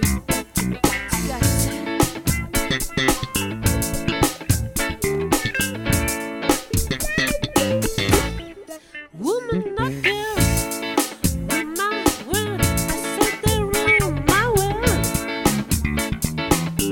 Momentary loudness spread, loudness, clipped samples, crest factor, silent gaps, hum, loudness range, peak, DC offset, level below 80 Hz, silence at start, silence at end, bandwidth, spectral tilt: 5 LU; -21 LUFS; under 0.1%; 20 dB; none; none; 3 LU; 0 dBFS; under 0.1%; -32 dBFS; 0 s; 0 s; 17.5 kHz; -4 dB/octave